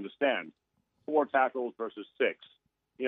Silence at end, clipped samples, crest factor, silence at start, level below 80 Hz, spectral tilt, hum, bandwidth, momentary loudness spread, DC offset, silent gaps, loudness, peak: 0 s; under 0.1%; 20 dB; 0 s; -88 dBFS; -1 dB/octave; none; 4 kHz; 19 LU; under 0.1%; none; -31 LUFS; -14 dBFS